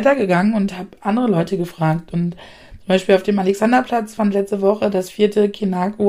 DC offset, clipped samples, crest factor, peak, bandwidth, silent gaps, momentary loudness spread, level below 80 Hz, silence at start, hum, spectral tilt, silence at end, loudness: under 0.1%; under 0.1%; 16 dB; -2 dBFS; 15 kHz; none; 8 LU; -50 dBFS; 0 s; none; -7 dB/octave; 0 s; -18 LUFS